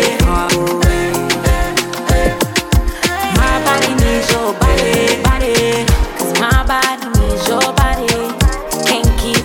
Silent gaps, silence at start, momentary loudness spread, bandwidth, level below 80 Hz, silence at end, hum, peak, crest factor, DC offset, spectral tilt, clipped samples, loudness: none; 0 s; 4 LU; 17.5 kHz; -18 dBFS; 0 s; none; 0 dBFS; 12 dB; under 0.1%; -4 dB/octave; under 0.1%; -14 LUFS